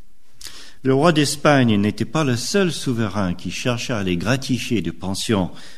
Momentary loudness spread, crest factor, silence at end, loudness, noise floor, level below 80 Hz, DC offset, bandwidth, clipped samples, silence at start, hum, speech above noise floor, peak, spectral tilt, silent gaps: 10 LU; 20 dB; 0.05 s; -20 LUFS; -42 dBFS; -48 dBFS; 2%; 13.5 kHz; under 0.1%; 0.4 s; none; 23 dB; 0 dBFS; -5 dB/octave; none